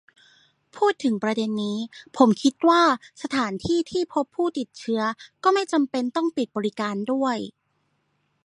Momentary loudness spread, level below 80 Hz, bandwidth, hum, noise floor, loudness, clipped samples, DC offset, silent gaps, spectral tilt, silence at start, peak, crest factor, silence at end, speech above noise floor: 10 LU; -62 dBFS; 11.5 kHz; none; -71 dBFS; -24 LUFS; under 0.1%; under 0.1%; none; -5 dB/octave; 0.75 s; -2 dBFS; 22 dB; 0.95 s; 48 dB